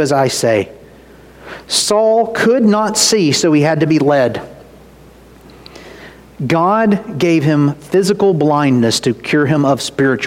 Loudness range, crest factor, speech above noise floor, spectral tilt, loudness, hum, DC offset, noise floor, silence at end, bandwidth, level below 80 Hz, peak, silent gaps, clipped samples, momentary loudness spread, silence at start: 5 LU; 14 dB; 28 dB; -4.5 dB/octave; -13 LUFS; none; under 0.1%; -41 dBFS; 0 s; 16.5 kHz; -50 dBFS; 0 dBFS; none; under 0.1%; 6 LU; 0 s